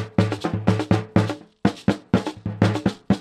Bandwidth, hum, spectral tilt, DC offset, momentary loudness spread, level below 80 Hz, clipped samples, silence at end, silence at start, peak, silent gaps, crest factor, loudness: 10.5 kHz; none; -7.5 dB/octave; under 0.1%; 5 LU; -46 dBFS; under 0.1%; 0 s; 0 s; -2 dBFS; none; 20 dB; -23 LUFS